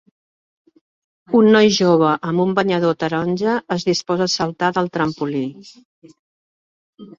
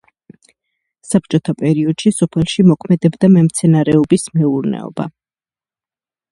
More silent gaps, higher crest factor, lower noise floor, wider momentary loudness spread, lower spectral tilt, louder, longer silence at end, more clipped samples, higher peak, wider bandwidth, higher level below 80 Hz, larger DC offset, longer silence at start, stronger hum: first, 5.85-6.02 s, 6.19-6.98 s vs none; about the same, 18 dB vs 14 dB; about the same, under -90 dBFS vs under -90 dBFS; about the same, 8 LU vs 10 LU; about the same, -5.5 dB/octave vs -6.5 dB/octave; second, -17 LUFS vs -14 LUFS; second, 0.1 s vs 1.2 s; neither; about the same, -2 dBFS vs 0 dBFS; second, 7.6 kHz vs 11.5 kHz; second, -58 dBFS vs -50 dBFS; neither; first, 1.3 s vs 1.05 s; neither